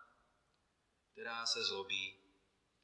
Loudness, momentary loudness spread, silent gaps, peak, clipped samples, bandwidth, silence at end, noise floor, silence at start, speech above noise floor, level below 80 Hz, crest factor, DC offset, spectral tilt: -39 LUFS; 10 LU; none; -22 dBFS; under 0.1%; 11.5 kHz; 0.7 s; -80 dBFS; 0 s; 39 dB; -88 dBFS; 24 dB; under 0.1%; 0 dB/octave